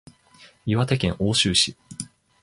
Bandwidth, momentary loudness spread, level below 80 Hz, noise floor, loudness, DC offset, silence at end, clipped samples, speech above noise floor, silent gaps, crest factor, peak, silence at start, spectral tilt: 11.5 kHz; 18 LU; -46 dBFS; -53 dBFS; -21 LUFS; under 0.1%; 0.35 s; under 0.1%; 31 dB; none; 18 dB; -6 dBFS; 0.4 s; -4 dB/octave